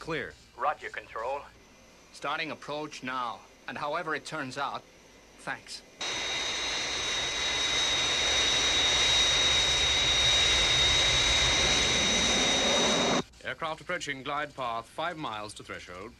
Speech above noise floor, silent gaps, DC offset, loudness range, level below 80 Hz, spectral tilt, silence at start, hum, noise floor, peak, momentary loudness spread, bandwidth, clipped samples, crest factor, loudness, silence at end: 20 dB; none; under 0.1%; 14 LU; -46 dBFS; -1 dB/octave; 0 s; none; -56 dBFS; -14 dBFS; 17 LU; 13 kHz; under 0.1%; 16 dB; -26 LUFS; 0.05 s